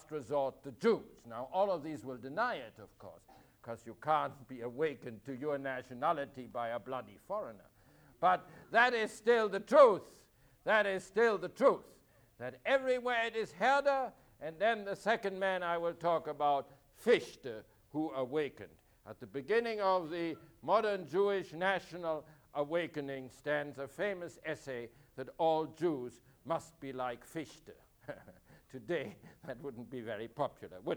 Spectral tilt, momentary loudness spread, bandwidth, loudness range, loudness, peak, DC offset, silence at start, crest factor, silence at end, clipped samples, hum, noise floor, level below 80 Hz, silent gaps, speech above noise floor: -5 dB/octave; 17 LU; over 20 kHz; 10 LU; -35 LUFS; -12 dBFS; under 0.1%; 0.1 s; 24 dB; 0 s; under 0.1%; none; -64 dBFS; -72 dBFS; none; 29 dB